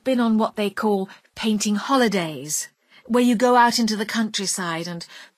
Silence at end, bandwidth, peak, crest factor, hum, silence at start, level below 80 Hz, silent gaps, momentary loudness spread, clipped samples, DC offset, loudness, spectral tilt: 0.15 s; 15.5 kHz; -4 dBFS; 18 dB; none; 0.05 s; -64 dBFS; none; 11 LU; under 0.1%; under 0.1%; -21 LUFS; -3.5 dB/octave